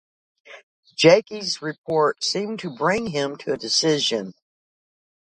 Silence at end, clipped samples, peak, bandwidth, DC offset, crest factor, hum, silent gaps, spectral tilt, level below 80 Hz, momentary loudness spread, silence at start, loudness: 1.05 s; under 0.1%; -2 dBFS; 9.6 kHz; under 0.1%; 22 dB; none; 0.63-0.83 s, 1.78-1.84 s; -3.5 dB/octave; -64 dBFS; 13 LU; 0.5 s; -21 LUFS